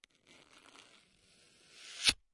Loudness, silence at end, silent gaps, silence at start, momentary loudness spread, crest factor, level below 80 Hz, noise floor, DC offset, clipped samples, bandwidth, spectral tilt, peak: -31 LUFS; 0.2 s; none; 1.8 s; 28 LU; 30 dB; -64 dBFS; -67 dBFS; under 0.1%; under 0.1%; 11.5 kHz; 0.5 dB/octave; -12 dBFS